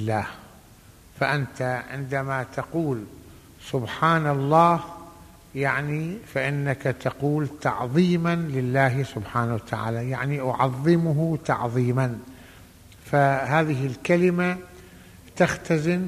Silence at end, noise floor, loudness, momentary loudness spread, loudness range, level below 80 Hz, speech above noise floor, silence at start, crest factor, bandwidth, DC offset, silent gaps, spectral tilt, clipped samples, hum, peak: 0 s; -50 dBFS; -24 LUFS; 9 LU; 3 LU; -54 dBFS; 27 dB; 0 s; 20 dB; 15 kHz; under 0.1%; none; -7 dB/octave; under 0.1%; none; -4 dBFS